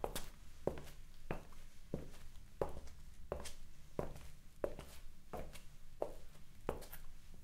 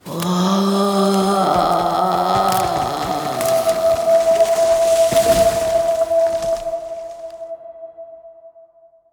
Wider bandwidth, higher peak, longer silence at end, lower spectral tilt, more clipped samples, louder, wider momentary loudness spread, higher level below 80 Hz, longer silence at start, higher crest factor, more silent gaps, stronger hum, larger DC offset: second, 16 kHz vs over 20 kHz; second, -20 dBFS vs -4 dBFS; second, 0 s vs 0.65 s; about the same, -5 dB/octave vs -5 dB/octave; neither; second, -50 LUFS vs -16 LUFS; second, 15 LU vs 18 LU; second, -52 dBFS vs -44 dBFS; about the same, 0 s vs 0.05 s; first, 24 dB vs 14 dB; neither; neither; neither